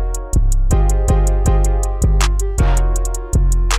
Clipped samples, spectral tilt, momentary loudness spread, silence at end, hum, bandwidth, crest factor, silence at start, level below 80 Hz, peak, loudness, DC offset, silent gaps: under 0.1%; -5 dB/octave; 4 LU; 0 s; none; 15 kHz; 12 dB; 0 s; -14 dBFS; -2 dBFS; -17 LUFS; under 0.1%; none